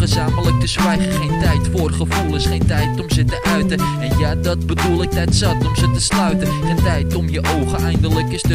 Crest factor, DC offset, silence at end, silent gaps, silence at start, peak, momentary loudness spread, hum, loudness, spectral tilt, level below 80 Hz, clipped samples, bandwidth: 12 dB; 0.3%; 0 s; none; 0 s; -4 dBFS; 3 LU; none; -17 LUFS; -5.5 dB/octave; -24 dBFS; under 0.1%; 16 kHz